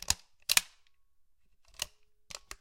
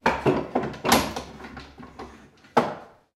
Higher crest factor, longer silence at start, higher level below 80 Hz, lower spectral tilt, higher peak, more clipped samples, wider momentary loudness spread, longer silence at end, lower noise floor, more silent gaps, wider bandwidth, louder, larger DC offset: first, 34 dB vs 22 dB; about the same, 0 s vs 0.05 s; second, -58 dBFS vs -48 dBFS; second, 1 dB/octave vs -4 dB/octave; about the same, -4 dBFS vs -4 dBFS; neither; about the same, 20 LU vs 21 LU; second, 0.05 s vs 0.3 s; first, -71 dBFS vs -50 dBFS; neither; about the same, 17 kHz vs 16 kHz; second, -31 LUFS vs -25 LUFS; neither